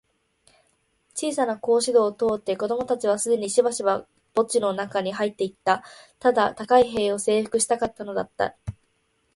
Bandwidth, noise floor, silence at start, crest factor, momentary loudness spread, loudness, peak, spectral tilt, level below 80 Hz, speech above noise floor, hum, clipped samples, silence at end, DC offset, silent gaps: 12 kHz; -69 dBFS; 1.15 s; 20 dB; 9 LU; -24 LUFS; -4 dBFS; -3.5 dB/octave; -58 dBFS; 46 dB; none; under 0.1%; 0.65 s; under 0.1%; none